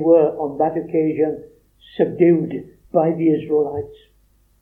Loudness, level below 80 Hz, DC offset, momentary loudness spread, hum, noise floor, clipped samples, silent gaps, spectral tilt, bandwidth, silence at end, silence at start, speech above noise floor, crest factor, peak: -19 LUFS; -56 dBFS; under 0.1%; 16 LU; none; -57 dBFS; under 0.1%; none; -10.5 dB/octave; 3.8 kHz; 0.7 s; 0 s; 40 dB; 16 dB; -4 dBFS